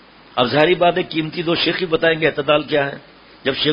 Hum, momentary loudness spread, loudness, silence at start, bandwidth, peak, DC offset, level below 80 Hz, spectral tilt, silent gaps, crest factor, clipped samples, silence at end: none; 10 LU; -18 LUFS; 0.35 s; 5.4 kHz; 0 dBFS; under 0.1%; -52 dBFS; -8 dB/octave; none; 18 dB; under 0.1%; 0 s